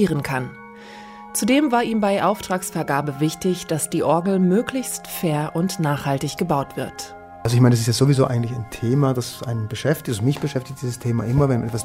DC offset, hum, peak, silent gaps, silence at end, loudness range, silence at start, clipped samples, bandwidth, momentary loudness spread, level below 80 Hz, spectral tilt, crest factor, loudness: under 0.1%; none; -4 dBFS; none; 0 s; 2 LU; 0 s; under 0.1%; 16 kHz; 11 LU; -48 dBFS; -6 dB/octave; 16 dB; -21 LUFS